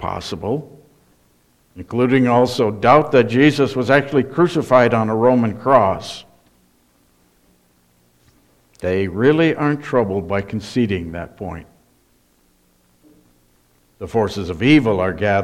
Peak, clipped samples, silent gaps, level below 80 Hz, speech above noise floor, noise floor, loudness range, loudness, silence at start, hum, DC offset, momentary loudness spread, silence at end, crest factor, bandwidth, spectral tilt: 0 dBFS; under 0.1%; none; -50 dBFS; 42 dB; -58 dBFS; 14 LU; -17 LUFS; 0 s; none; under 0.1%; 14 LU; 0 s; 18 dB; 13.5 kHz; -7 dB/octave